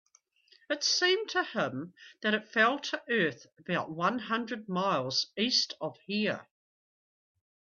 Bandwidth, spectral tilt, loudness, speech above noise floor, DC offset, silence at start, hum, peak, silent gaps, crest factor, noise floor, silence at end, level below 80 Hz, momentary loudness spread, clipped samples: 7.6 kHz; -3 dB/octave; -30 LUFS; 34 dB; under 0.1%; 0.7 s; none; -12 dBFS; none; 20 dB; -65 dBFS; 1.3 s; -78 dBFS; 9 LU; under 0.1%